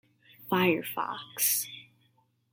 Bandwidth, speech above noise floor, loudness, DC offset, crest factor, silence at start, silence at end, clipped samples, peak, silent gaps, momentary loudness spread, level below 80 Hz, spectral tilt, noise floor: 17 kHz; 41 dB; -29 LUFS; under 0.1%; 20 dB; 0.4 s; 0.7 s; under 0.1%; -12 dBFS; none; 17 LU; -76 dBFS; -3 dB/octave; -70 dBFS